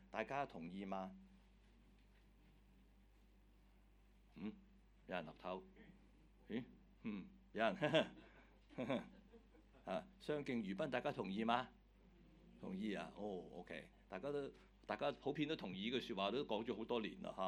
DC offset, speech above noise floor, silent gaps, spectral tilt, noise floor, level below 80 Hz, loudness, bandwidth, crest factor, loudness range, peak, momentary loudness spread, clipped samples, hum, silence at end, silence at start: under 0.1%; 25 dB; none; -6 dB/octave; -70 dBFS; -70 dBFS; -46 LUFS; 18 kHz; 26 dB; 12 LU; -22 dBFS; 17 LU; under 0.1%; 50 Hz at -70 dBFS; 0 s; 0 s